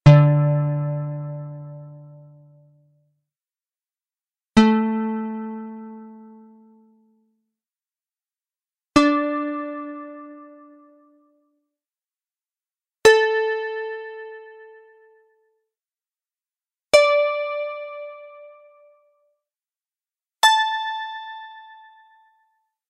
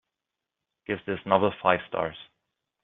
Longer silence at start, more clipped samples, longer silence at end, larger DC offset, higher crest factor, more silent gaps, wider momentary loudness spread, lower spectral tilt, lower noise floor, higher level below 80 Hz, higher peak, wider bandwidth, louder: second, 0.05 s vs 0.9 s; neither; first, 1.3 s vs 0.6 s; neither; about the same, 24 dB vs 24 dB; neither; first, 25 LU vs 15 LU; first, -6 dB/octave vs -3.5 dB/octave; about the same, under -90 dBFS vs -87 dBFS; first, -54 dBFS vs -64 dBFS; first, 0 dBFS vs -4 dBFS; first, 11.5 kHz vs 4.1 kHz; first, -20 LUFS vs -27 LUFS